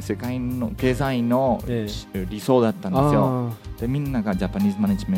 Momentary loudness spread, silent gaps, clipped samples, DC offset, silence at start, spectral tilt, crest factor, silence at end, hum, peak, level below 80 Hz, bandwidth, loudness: 9 LU; none; under 0.1%; under 0.1%; 0 s; -7.5 dB/octave; 18 dB; 0 s; none; -4 dBFS; -38 dBFS; 16.5 kHz; -23 LUFS